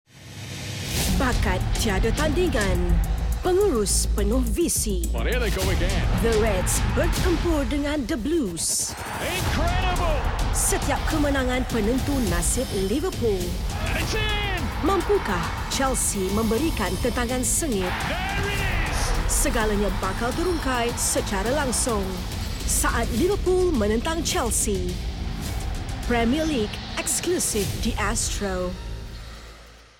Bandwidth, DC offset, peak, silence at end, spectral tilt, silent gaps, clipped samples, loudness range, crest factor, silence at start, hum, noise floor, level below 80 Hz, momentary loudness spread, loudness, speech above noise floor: 17 kHz; under 0.1%; -12 dBFS; 0.15 s; -4 dB/octave; none; under 0.1%; 2 LU; 12 dB; 0.15 s; none; -46 dBFS; -28 dBFS; 7 LU; -24 LUFS; 23 dB